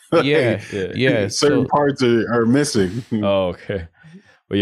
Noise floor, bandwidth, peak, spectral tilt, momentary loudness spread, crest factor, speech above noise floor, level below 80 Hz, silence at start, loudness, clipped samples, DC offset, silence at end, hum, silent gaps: -46 dBFS; 12.5 kHz; -6 dBFS; -5.5 dB/octave; 9 LU; 12 dB; 28 dB; -50 dBFS; 0.1 s; -18 LUFS; under 0.1%; under 0.1%; 0 s; none; none